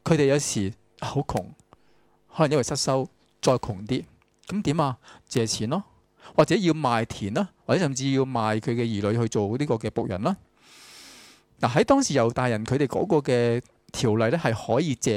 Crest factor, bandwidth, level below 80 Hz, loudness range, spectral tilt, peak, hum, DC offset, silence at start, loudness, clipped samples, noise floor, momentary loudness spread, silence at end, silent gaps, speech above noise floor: 20 dB; 15.5 kHz; -54 dBFS; 4 LU; -5.5 dB/octave; -6 dBFS; none; under 0.1%; 0.05 s; -25 LUFS; under 0.1%; -62 dBFS; 10 LU; 0 s; none; 38 dB